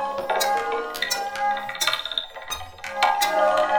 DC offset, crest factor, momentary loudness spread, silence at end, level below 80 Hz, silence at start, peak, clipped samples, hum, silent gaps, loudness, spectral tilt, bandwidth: under 0.1%; 18 dB; 12 LU; 0 s; -56 dBFS; 0 s; -6 dBFS; under 0.1%; none; none; -24 LUFS; -0.5 dB/octave; over 20 kHz